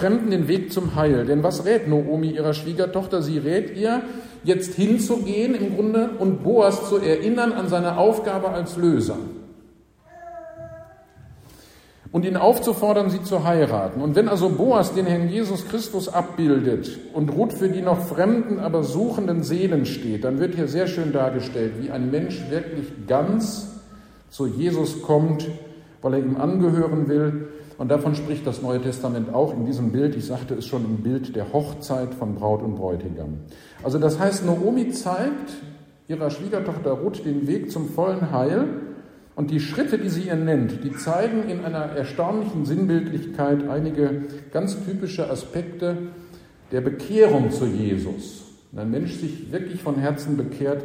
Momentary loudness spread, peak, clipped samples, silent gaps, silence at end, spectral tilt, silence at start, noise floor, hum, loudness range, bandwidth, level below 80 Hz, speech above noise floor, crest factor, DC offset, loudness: 10 LU; -2 dBFS; under 0.1%; none; 0 s; -7 dB/octave; 0 s; -53 dBFS; none; 6 LU; 16 kHz; -52 dBFS; 31 dB; 20 dB; under 0.1%; -23 LUFS